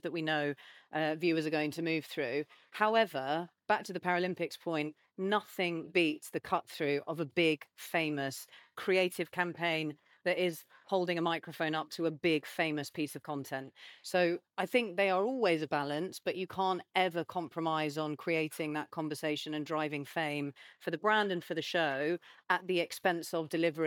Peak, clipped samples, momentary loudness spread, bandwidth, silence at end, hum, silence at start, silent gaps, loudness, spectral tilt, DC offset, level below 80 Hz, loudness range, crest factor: -14 dBFS; under 0.1%; 9 LU; 19 kHz; 0 s; none; 0.05 s; none; -34 LUFS; -5 dB/octave; under 0.1%; -86 dBFS; 2 LU; 20 dB